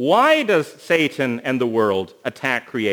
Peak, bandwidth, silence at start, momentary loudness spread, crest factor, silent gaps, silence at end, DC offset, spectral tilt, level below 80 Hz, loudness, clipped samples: -2 dBFS; over 20 kHz; 0 s; 9 LU; 18 dB; none; 0 s; under 0.1%; -5 dB/octave; -70 dBFS; -19 LUFS; under 0.1%